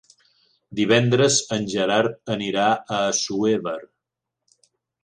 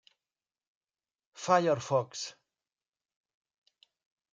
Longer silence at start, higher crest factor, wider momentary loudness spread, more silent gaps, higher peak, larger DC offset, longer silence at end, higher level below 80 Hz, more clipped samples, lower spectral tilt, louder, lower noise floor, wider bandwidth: second, 0.7 s vs 1.35 s; about the same, 22 dB vs 24 dB; second, 9 LU vs 15 LU; neither; first, -2 dBFS vs -12 dBFS; neither; second, 1.2 s vs 2 s; first, -64 dBFS vs -82 dBFS; neither; about the same, -4 dB/octave vs -4.5 dB/octave; first, -21 LUFS vs -30 LUFS; second, -83 dBFS vs under -90 dBFS; first, 10.5 kHz vs 9.4 kHz